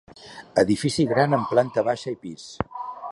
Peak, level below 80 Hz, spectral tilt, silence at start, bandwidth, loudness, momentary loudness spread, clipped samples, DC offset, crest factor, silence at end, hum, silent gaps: -4 dBFS; -54 dBFS; -6 dB/octave; 0.2 s; 11.5 kHz; -23 LUFS; 15 LU; under 0.1%; under 0.1%; 20 dB; 0 s; none; none